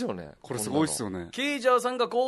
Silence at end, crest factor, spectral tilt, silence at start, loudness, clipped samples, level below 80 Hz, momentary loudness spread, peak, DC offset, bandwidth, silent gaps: 0 s; 16 dB; -4 dB/octave; 0 s; -28 LUFS; under 0.1%; -62 dBFS; 11 LU; -12 dBFS; under 0.1%; 12 kHz; none